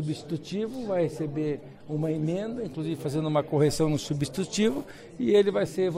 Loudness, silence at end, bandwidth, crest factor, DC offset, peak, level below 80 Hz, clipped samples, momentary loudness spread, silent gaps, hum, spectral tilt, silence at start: -28 LUFS; 0 s; 15.5 kHz; 16 dB; under 0.1%; -12 dBFS; -54 dBFS; under 0.1%; 10 LU; none; none; -6 dB/octave; 0 s